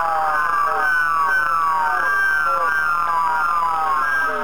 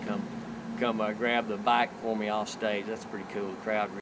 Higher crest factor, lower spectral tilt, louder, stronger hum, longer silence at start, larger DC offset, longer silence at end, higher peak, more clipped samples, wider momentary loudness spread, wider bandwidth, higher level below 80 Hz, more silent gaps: second, 12 dB vs 20 dB; second, -2.5 dB/octave vs -5 dB/octave; first, -18 LUFS vs -31 LUFS; neither; about the same, 0 s vs 0 s; first, 2% vs under 0.1%; about the same, 0 s vs 0 s; first, -6 dBFS vs -10 dBFS; neither; second, 2 LU vs 11 LU; first, over 20 kHz vs 8 kHz; first, -52 dBFS vs -66 dBFS; neither